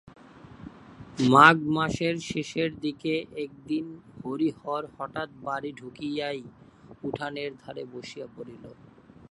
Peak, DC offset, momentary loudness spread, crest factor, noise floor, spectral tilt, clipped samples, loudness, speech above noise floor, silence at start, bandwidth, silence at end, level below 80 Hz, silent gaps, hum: 0 dBFS; under 0.1%; 21 LU; 28 dB; -48 dBFS; -5.5 dB/octave; under 0.1%; -26 LUFS; 21 dB; 0.35 s; 11.5 kHz; 0.6 s; -60 dBFS; none; none